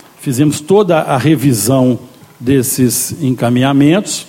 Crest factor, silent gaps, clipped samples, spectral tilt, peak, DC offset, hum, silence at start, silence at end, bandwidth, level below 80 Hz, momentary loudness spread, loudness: 12 dB; none; under 0.1%; -5.5 dB/octave; 0 dBFS; under 0.1%; none; 0.2 s; 0.05 s; 17 kHz; -48 dBFS; 5 LU; -12 LUFS